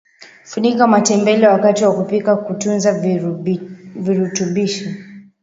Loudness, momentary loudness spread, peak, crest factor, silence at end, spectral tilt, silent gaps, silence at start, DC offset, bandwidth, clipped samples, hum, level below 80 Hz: -16 LUFS; 13 LU; 0 dBFS; 16 dB; 0.2 s; -5 dB/octave; none; 0.2 s; under 0.1%; 8 kHz; under 0.1%; none; -62 dBFS